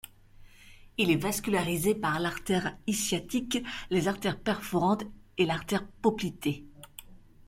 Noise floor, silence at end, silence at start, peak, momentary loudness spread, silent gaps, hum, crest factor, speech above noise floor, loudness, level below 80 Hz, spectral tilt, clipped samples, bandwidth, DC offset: -53 dBFS; 0.3 s; 0.05 s; -10 dBFS; 12 LU; none; none; 20 dB; 23 dB; -30 LUFS; -54 dBFS; -4.5 dB/octave; under 0.1%; 16.5 kHz; under 0.1%